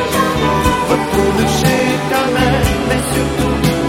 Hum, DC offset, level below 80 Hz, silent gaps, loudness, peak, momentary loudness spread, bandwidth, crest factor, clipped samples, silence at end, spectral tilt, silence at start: none; under 0.1%; -26 dBFS; none; -14 LUFS; 0 dBFS; 2 LU; 16.5 kHz; 14 dB; under 0.1%; 0 s; -5 dB/octave; 0 s